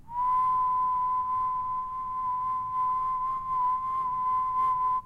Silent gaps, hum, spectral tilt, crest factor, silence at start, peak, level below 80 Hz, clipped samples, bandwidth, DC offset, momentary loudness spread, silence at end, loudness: none; none; -5.5 dB/octave; 8 dB; 0.05 s; -20 dBFS; -56 dBFS; under 0.1%; 3.9 kHz; under 0.1%; 5 LU; 0 s; -28 LUFS